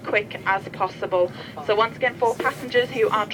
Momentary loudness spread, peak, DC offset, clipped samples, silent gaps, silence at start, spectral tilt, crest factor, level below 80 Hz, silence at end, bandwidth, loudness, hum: 5 LU; -6 dBFS; under 0.1%; under 0.1%; none; 0 s; -4.5 dB/octave; 16 dB; -62 dBFS; 0 s; 18.5 kHz; -23 LUFS; none